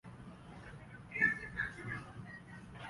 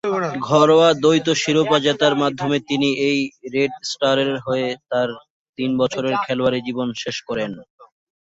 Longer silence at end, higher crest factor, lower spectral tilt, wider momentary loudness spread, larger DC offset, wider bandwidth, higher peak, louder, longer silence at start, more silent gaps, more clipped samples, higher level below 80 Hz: second, 0 s vs 0.45 s; first, 24 dB vs 16 dB; about the same, -5.5 dB/octave vs -4.5 dB/octave; first, 20 LU vs 11 LU; neither; first, 11.5 kHz vs 8 kHz; second, -18 dBFS vs -2 dBFS; second, -37 LUFS vs -19 LUFS; about the same, 0.05 s vs 0.05 s; second, none vs 5.30-5.53 s, 7.70-7.78 s; neither; about the same, -62 dBFS vs -60 dBFS